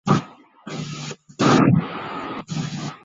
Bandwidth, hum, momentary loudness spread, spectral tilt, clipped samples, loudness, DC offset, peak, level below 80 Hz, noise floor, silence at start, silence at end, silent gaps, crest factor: 7.8 kHz; none; 17 LU; -6 dB/octave; under 0.1%; -22 LUFS; under 0.1%; -4 dBFS; -52 dBFS; -41 dBFS; 0.05 s; 0.1 s; none; 18 dB